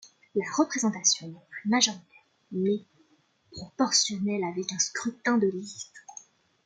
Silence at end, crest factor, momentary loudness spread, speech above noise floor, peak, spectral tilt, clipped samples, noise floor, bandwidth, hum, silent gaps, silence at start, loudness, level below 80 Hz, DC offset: 0.45 s; 22 dB; 20 LU; 39 dB; -8 dBFS; -2.5 dB/octave; under 0.1%; -67 dBFS; 10.5 kHz; none; none; 0.05 s; -27 LUFS; -72 dBFS; under 0.1%